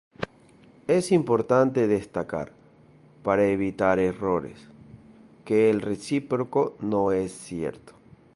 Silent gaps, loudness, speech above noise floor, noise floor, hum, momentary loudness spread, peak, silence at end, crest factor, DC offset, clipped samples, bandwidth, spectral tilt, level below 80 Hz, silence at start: none; -25 LUFS; 30 dB; -54 dBFS; none; 13 LU; -6 dBFS; 0.45 s; 20 dB; under 0.1%; under 0.1%; 11.5 kHz; -6.5 dB/octave; -56 dBFS; 0.2 s